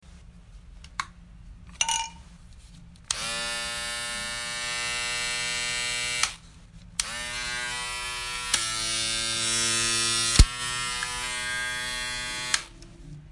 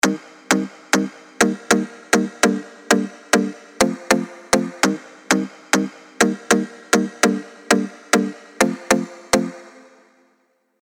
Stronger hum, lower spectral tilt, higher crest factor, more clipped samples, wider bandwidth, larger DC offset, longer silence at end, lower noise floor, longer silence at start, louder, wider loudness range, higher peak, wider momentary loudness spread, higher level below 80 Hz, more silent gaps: neither; second, -1 dB/octave vs -3.5 dB/octave; first, 28 dB vs 20 dB; neither; second, 11.5 kHz vs over 20 kHz; neither; second, 0 s vs 1.2 s; second, -48 dBFS vs -64 dBFS; about the same, 0.05 s vs 0.05 s; second, -27 LUFS vs -20 LUFS; first, 7 LU vs 1 LU; about the same, 0 dBFS vs 0 dBFS; first, 10 LU vs 3 LU; first, -36 dBFS vs -54 dBFS; neither